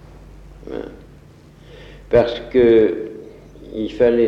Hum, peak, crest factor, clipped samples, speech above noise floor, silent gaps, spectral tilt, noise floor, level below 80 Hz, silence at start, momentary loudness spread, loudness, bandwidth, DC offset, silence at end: none; -4 dBFS; 16 dB; under 0.1%; 29 dB; none; -8 dB/octave; -44 dBFS; -42 dBFS; 0.65 s; 22 LU; -17 LUFS; 6.6 kHz; under 0.1%; 0 s